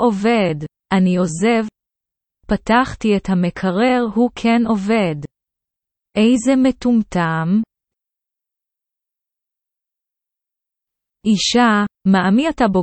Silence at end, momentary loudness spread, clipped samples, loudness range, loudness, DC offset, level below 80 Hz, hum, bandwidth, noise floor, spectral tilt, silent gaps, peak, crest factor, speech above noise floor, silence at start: 0 s; 8 LU; under 0.1%; 6 LU; -17 LUFS; under 0.1%; -46 dBFS; none; 8.8 kHz; -85 dBFS; -5.5 dB/octave; none; -2 dBFS; 16 dB; 69 dB; 0 s